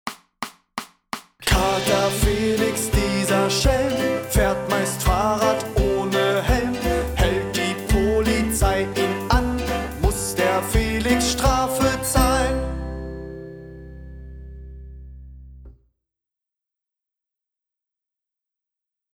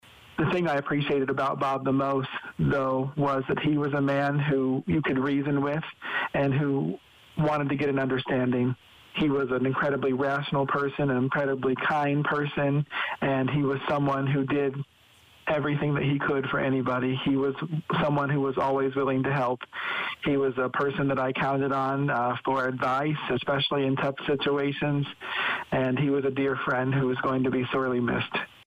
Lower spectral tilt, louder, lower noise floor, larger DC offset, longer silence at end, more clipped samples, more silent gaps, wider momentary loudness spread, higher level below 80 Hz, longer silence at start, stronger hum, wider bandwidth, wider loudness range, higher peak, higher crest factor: second, -4.5 dB/octave vs -8 dB/octave; first, -21 LUFS vs -27 LUFS; first, -87 dBFS vs -57 dBFS; neither; first, 3.4 s vs 0.2 s; neither; neither; first, 19 LU vs 4 LU; first, -30 dBFS vs -58 dBFS; second, 0.05 s vs 0.3 s; neither; first, over 20 kHz vs 8 kHz; first, 6 LU vs 1 LU; first, -2 dBFS vs -18 dBFS; first, 20 dB vs 8 dB